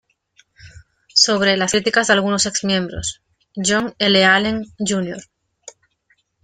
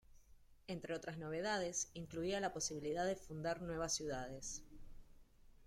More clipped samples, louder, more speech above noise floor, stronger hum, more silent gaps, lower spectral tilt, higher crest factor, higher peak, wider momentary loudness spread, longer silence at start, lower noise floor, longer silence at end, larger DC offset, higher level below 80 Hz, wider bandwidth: neither; first, -17 LUFS vs -43 LUFS; first, 46 dB vs 22 dB; neither; neither; about the same, -2.5 dB/octave vs -3.5 dB/octave; about the same, 18 dB vs 18 dB; first, 0 dBFS vs -26 dBFS; first, 13 LU vs 8 LU; first, 0.65 s vs 0.1 s; about the same, -63 dBFS vs -65 dBFS; first, 0.75 s vs 0 s; neither; first, -48 dBFS vs -62 dBFS; second, 9.8 kHz vs 16.5 kHz